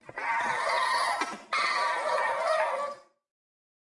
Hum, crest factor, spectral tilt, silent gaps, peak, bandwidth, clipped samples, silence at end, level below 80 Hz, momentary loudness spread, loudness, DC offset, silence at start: none; 18 dB; -1 dB/octave; none; -12 dBFS; 11.5 kHz; under 0.1%; 0.95 s; -76 dBFS; 6 LU; -28 LUFS; under 0.1%; 0.05 s